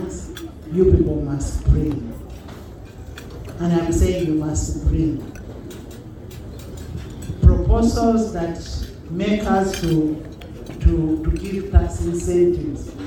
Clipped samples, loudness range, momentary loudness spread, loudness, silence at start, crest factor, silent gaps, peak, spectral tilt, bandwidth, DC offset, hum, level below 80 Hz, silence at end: under 0.1%; 3 LU; 19 LU; -20 LUFS; 0 s; 20 dB; none; 0 dBFS; -7 dB/octave; 18 kHz; under 0.1%; none; -26 dBFS; 0 s